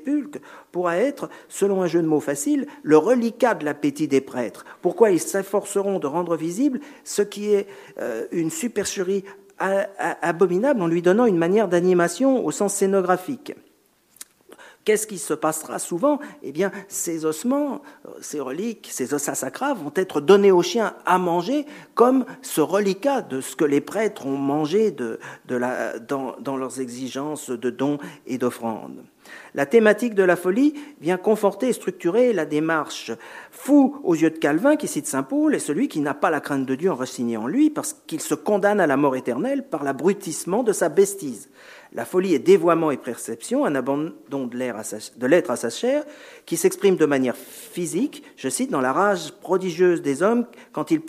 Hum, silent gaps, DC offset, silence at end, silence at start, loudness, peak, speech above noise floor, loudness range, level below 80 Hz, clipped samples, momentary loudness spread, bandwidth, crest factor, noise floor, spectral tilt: none; none; under 0.1%; 0 s; 0 s; -22 LUFS; -2 dBFS; 38 dB; 6 LU; -74 dBFS; under 0.1%; 12 LU; 15.5 kHz; 20 dB; -60 dBFS; -5 dB/octave